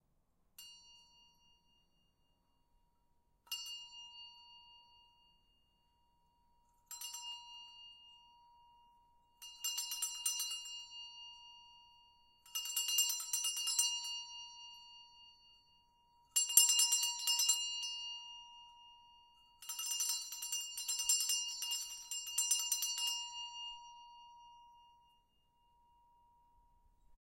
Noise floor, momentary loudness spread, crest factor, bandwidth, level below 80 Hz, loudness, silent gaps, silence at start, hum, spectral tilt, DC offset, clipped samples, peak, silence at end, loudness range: -77 dBFS; 24 LU; 32 dB; 16.5 kHz; -80 dBFS; -35 LUFS; none; 0.6 s; none; 6 dB/octave; under 0.1%; under 0.1%; -10 dBFS; 0.15 s; 19 LU